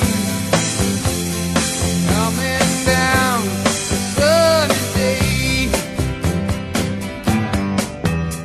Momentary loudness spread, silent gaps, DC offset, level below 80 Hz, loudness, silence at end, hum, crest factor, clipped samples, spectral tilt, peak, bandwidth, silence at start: 7 LU; none; under 0.1%; -32 dBFS; -17 LUFS; 0 s; none; 16 dB; under 0.1%; -4 dB/octave; -2 dBFS; 13 kHz; 0 s